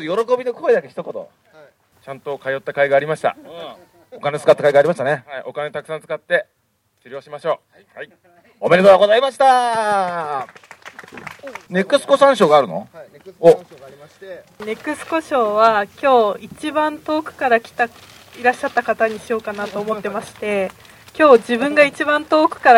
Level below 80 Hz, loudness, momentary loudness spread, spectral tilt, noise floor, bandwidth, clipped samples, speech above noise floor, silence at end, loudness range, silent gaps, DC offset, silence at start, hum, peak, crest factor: -64 dBFS; -17 LUFS; 22 LU; -5 dB/octave; -65 dBFS; 15.5 kHz; under 0.1%; 48 dB; 0 s; 6 LU; none; under 0.1%; 0 s; none; 0 dBFS; 18 dB